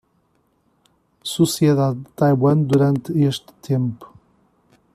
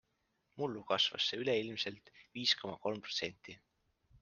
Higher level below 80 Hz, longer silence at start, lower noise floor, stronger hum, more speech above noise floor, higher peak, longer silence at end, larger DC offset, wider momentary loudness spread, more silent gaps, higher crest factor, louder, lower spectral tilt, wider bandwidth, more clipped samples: first, -56 dBFS vs -78 dBFS; first, 1.25 s vs 0.55 s; second, -64 dBFS vs -81 dBFS; neither; about the same, 46 dB vs 43 dB; first, -4 dBFS vs -18 dBFS; first, 0.9 s vs 0.05 s; neither; second, 12 LU vs 17 LU; neither; second, 16 dB vs 22 dB; first, -19 LUFS vs -36 LUFS; first, -7 dB/octave vs -3 dB/octave; first, 14.5 kHz vs 10 kHz; neither